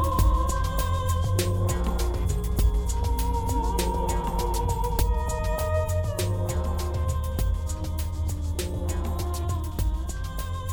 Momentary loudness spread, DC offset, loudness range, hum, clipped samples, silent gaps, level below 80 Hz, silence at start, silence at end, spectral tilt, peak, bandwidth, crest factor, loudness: 5 LU; under 0.1%; 3 LU; none; under 0.1%; none; -28 dBFS; 0 s; 0 s; -5.5 dB/octave; -10 dBFS; 19.5 kHz; 16 dB; -27 LUFS